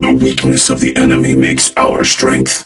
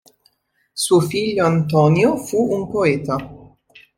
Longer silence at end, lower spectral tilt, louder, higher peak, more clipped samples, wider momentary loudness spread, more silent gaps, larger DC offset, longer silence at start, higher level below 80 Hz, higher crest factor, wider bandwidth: second, 0 s vs 0.5 s; second, -3.5 dB/octave vs -6 dB/octave; first, -10 LUFS vs -18 LUFS; about the same, 0 dBFS vs -2 dBFS; neither; second, 1 LU vs 10 LU; neither; neither; second, 0 s vs 0.75 s; first, -34 dBFS vs -52 dBFS; second, 10 dB vs 16 dB; second, 12 kHz vs 16 kHz